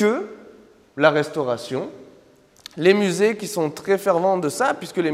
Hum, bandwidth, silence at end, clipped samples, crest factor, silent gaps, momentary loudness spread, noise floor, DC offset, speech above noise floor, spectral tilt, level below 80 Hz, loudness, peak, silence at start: none; 16 kHz; 0 s; under 0.1%; 20 dB; none; 12 LU; -53 dBFS; under 0.1%; 32 dB; -5 dB/octave; -68 dBFS; -21 LUFS; -2 dBFS; 0 s